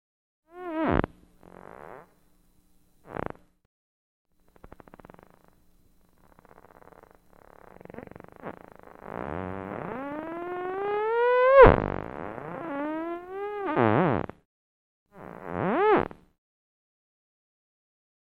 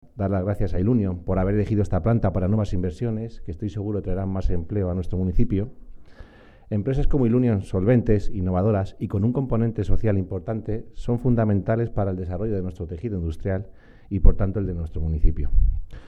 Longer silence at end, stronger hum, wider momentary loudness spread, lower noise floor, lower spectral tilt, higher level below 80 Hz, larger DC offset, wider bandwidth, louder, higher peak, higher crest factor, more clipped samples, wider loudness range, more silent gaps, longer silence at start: first, 2.25 s vs 0 s; neither; first, 25 LU vs 8 LU; first, -62 dBFS vs -47 dBFS; about the same, -9 dB/octave vs -10 dB/octave; second, -42 dBFS vs -28 dBFS; neither; second, 5 kHz vs 6.4 kHz; about the same, -25 LUFS vs -25 LUFS; about the same, 0 dBFS vs -2 dBFS; first, 28 dB vs 20 dB; neither; first, 23 LU vs 5 LU; first, 3.65-4.25 s, 14.45-15.06 s vs none; first, 0.55 s vs 0.15 s